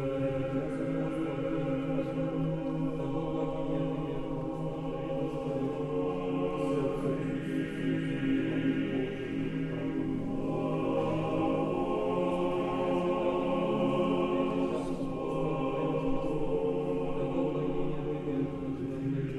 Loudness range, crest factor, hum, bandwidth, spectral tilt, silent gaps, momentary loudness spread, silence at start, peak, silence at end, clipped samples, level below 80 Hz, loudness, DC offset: 3 LU; 14 dB; none; 11 kHz; -8.5 dB/octave; none; 4 LU; 0 s; -16 dBFS; 0 s; under 0.1%; -48 dBFS; -32 LUFS; under 0.1%